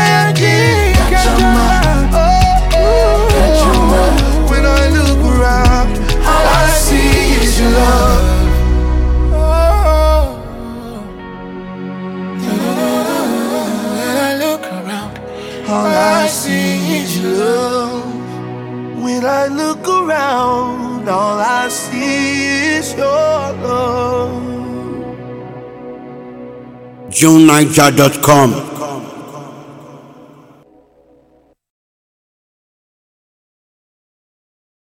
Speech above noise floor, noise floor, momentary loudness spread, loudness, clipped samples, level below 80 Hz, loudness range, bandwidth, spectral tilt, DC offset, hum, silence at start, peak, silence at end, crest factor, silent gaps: 43 dB; -53 dBFS; 17 LU; -12 LUFS; 0.2%; -18 dBFS; 8 LU; 17.5 kHz; -5 dB/octave; under 0.1%; none; 0 s; 0 dBFS; 5 s; 12 dB; none